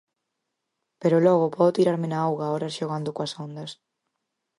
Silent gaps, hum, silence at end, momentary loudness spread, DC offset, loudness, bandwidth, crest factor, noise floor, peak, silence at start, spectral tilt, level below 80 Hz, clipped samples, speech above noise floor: none; none; 0.85 s; 15 LU; under 0.1%; -24 LUFS; 11.5 kHz; 18 dB; -81 dBFS; -8 dBFS; 1 s; -7 dB/octave; -74 dBFS; under 0.1%; 58 dB